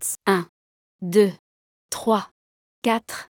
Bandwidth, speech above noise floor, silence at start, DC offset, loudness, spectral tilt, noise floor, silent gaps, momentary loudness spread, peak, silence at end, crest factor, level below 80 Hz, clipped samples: 19 kHz; over 68 dB; 0 s; under 0.1%; -23 LUFS; -4.5 dB/octave; under -90 dBFS; 0.49-0.99 s, 1.39-1.89 s, 2.31-2.82 s; 15 LU; -6 dBFS; 0.1 s; 20 dB; -70 dBFS; under 0.1%